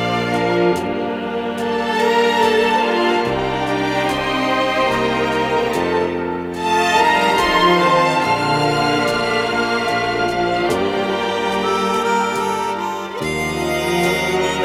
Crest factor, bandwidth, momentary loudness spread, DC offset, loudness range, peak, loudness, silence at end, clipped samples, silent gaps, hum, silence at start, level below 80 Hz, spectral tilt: 16 dB; 16.5 kHz; 7 LU; under 0.1%; 3 LU; -2 dBFS; -17 LUFS; 0 s; under 0.1%; none; none; 0 s; -44 dBFS; -4.5 dB/octave